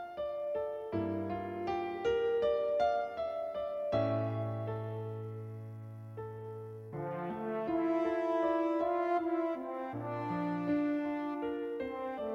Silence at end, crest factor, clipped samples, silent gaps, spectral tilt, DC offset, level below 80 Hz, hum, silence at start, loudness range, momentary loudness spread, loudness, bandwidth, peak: 0 s; 14 dB; under 0.1%; none; -8.5 dB/octave; under 0.1%; -66 dBFS; none; 0 s; 6 LU; 13 LU; -35 LUFS; 7 kHz; -20 dBFS